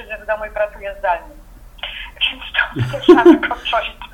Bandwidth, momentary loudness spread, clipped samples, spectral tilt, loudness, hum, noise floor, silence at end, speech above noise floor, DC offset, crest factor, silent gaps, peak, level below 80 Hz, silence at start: 8.4 kHz; 17 LU; 0.2%; -6.5 dB/octave; -16 LUFS; none; -35 dBFS; 0.1 s; 20 dB; under 0.1%; 16 dB; none; 0 dBFS; -40 dBFS; 0 s